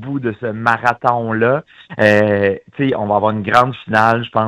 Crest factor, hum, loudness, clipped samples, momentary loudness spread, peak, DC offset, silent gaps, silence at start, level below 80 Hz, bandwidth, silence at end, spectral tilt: 16 dB; none; -15 LUFS; under 0.1%; 8 LU; 0 dBFS; under 0.1%; none; 0 s; -52 dBFS; 12.5 kHz; 0 s; -7 dB/octave